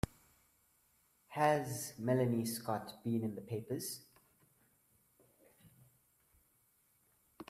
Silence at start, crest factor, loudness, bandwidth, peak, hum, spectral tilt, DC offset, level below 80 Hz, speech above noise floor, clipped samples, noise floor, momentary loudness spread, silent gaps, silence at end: 1.3 s; 24 dB; -38 LUFS; 16 kHz; -16 dBFS; none; -5.5 dB/octave; under 0.1%; -64 dBFS; 38 dB; under 0.1%; -74 dBFS; 12 LU; none; 0.05 s